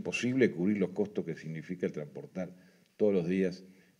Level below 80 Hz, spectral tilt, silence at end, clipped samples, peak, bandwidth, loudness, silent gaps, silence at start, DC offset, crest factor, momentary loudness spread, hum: -76 dBFS; -6.5 dB/octave; 0.3 s; under 0.1%; -14 dBFS; 11 kHz; -33 LUFS; none; 0 s; under 0.1%; 20 dB; 14 LU; none